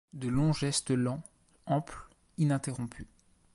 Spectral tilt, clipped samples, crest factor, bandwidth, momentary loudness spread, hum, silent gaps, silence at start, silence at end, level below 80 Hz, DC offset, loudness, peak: -5.5 dB/octave; under 0.1%; 16 dB; 11.5 kHz; 21 LU; none; none; 0.15 s; 0.5 s; -56 dBFS; under 0.1%; -32 LUFS; -16 dBFS